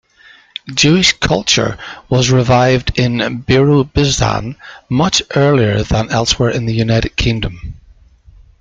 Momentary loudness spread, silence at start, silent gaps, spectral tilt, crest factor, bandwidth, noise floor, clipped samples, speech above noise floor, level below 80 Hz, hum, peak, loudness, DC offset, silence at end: 12 LU; 0.65 s; none; -4.5 dB/octave; 14 dB; 9.4 kHz; -45 dBFS; under 0.1%; 32 dB; -30 dBFS; none; 0 dBFS; -13 LUFS; under 0.1%; 0.85 s